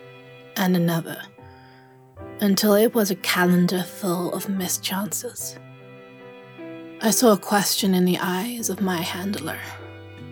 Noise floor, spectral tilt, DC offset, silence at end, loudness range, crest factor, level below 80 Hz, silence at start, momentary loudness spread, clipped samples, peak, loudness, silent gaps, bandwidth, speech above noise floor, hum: -49 dBFS; -4.5 dB/octave; under 0.1%; 0 s; 4 LU; 18 dB; -68 dBFS; 0 s; 22 LU; under 0.1%; -6 dBFS; -22 LUFS; none; over 20 kHz; 28 dB; none